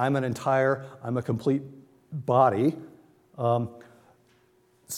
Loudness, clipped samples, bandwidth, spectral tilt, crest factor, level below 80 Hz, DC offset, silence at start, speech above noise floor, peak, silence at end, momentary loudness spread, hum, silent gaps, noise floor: -26 LUFS; under 0.1%; 16.5 kHz; -7 dB/octave; 20 dB; -70 dBFS; under 0.1%; 0 s; 38 dB; -8 dBFS; 0 s; 15 LU; none; none; -63 dBFS